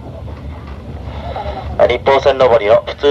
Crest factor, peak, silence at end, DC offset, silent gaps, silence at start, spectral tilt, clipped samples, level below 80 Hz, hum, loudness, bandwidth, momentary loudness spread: 14 dB; 0 dBFS; 0 s; under 0.1%; none; 0 s; -6 dB/octave; under 0.1%; -30 dBFS; none; -13 LUFS; 7.8 kHz; 19 LU